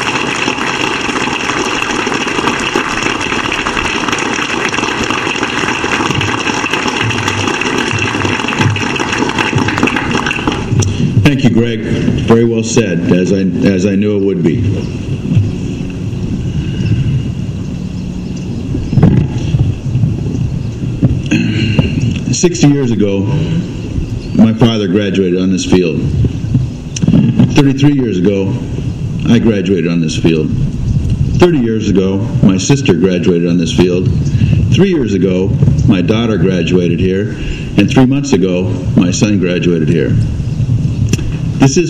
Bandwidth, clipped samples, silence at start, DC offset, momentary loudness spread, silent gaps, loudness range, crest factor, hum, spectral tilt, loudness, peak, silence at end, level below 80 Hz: 12 kHz; 0.3%; 0 s; under 0.1%; 8 LU; none; 4 LU; 12 dB; none; -6 dB/octave; -12 LUFS; 0 dBFS; 0 s; -28 dBFS